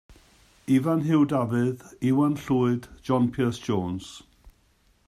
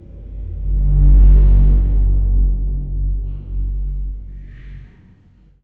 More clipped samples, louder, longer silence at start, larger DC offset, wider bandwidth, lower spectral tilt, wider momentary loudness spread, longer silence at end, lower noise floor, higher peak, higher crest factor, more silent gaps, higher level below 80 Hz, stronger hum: neither; second, -25 LUFS vs -17 LUFS; about the same, 0.1 s vs 0.1 s; neither; first, 14 kHz vs 1.1 kHz; second, -7.5 dB/octave vs -12 dB/octave; second, 10 LU vs 24 LU; second, 0.6 s vs 0.8 s; first, -64 dBFS vs -49 dBFS; second, -10 dBFS vs -2 dBFS; about the same, 16 dB vs 12 dB; neither; second, -56 dBFS vs -14 dBFS; neither